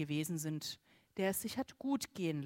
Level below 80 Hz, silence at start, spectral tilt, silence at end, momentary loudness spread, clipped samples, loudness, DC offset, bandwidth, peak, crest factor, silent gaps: -74 dBFS; 0 s; -4.5 dB/octave; 0 s; 9 LU; under 0.1%; -39 LUFS; under 0.1%; 16 kHz; -22 dBFS; 18 dB; none